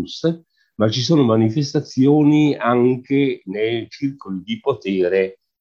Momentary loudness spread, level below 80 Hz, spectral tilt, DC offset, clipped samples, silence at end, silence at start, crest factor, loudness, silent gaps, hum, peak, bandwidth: 11 LU; -58 dBFS; -7 dB/octave; under 0.1%; under 0.1%; 0.25 s; 0 s; 16 dB; -18 LUFS; none; none; -2 dBFS; 7.2 kHz